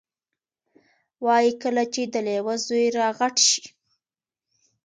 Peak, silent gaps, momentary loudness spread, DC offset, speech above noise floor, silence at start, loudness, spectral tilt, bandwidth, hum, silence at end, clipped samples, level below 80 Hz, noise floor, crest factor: -6 dBFS; none; 8 LU; under 0.1%; over 68 dB; 1.2 s; -22 LUFS; -1.5 dB/octave; 9.6 kHz; none; 1.15 s; under 0.1%; -76 dBFS; under -90 dBFS; 20 dB